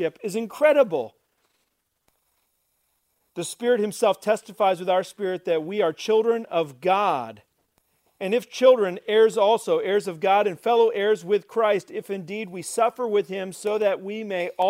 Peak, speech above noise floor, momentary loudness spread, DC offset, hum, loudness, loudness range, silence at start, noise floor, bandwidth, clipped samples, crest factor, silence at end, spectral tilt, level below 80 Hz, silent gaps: -4 dBFS; 51 dB; 12 LU; under 0.1%; none; -23 LUFS; 6 LU; 0 s; -74 dBFS; 16 kHz; under 0.1%; 20 dB; 0 s; -4.5 dB/octave; -78 dBFS; none